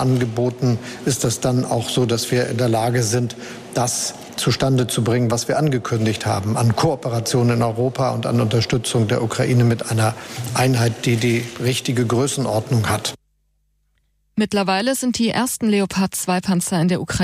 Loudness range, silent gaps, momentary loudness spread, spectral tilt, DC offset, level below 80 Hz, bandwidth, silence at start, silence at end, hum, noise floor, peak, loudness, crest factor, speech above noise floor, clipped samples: 3 LU; none; 4 LU; -5 dB/octave; under 0.1%; -48 dBFS; 15.5 kHz; 0 s; 0 s; none; -65 dBFS; -6 dBFS; -19 LUFS; 12 dB; 47 dB; under 0.1%